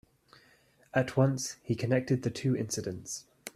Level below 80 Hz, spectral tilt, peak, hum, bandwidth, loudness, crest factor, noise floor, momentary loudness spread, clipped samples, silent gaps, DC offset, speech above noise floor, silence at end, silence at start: -66 dBFS; -5.5 dB/octave; -12 dBFS; none; 14 kHz; -31 LUFS; 20 dB; -64 dBFS; 11 LU; under 0.1%; none; under 0.1%; 34 dB; 0.05 s; 0.95 s